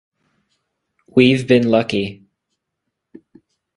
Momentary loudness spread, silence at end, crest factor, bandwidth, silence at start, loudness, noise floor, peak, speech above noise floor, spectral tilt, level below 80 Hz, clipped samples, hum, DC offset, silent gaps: 10 LU; 1.6 s; 20 dB; 11 kHz; 1.15 s; -16 LUFS; -78 dBFS; 0 dBFS; 63 dB; -6.5 dB/octave; -56 dBFS; under 0.1%; none; under 0.1%; none